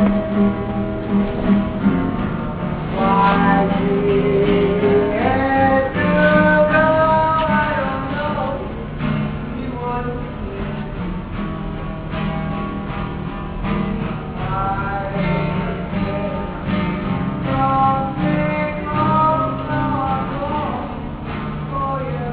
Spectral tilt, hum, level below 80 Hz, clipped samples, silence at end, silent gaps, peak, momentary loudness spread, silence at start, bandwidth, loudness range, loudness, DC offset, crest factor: -6 dB/octave; none; -32 dBFS; under 0.1%; 0 s; none; -2 dBFS; 12 LU; 0 s; 4.7 kHz; 10 LU; -19 LUFS; under 0.1%; 18 dB